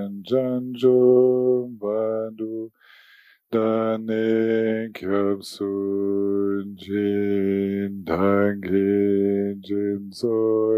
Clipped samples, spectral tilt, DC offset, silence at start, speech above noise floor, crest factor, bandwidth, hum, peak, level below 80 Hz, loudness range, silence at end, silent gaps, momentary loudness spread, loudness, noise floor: under 0.1%; -8 dB/octave; under 0.1%; 0 s; 33 dB; 16 dB; 14 kHz; none; -6 dBFS; -64 dBFS; 3 LU; 0 s; none; 9 LU; -22 LUFS; -54 dBFS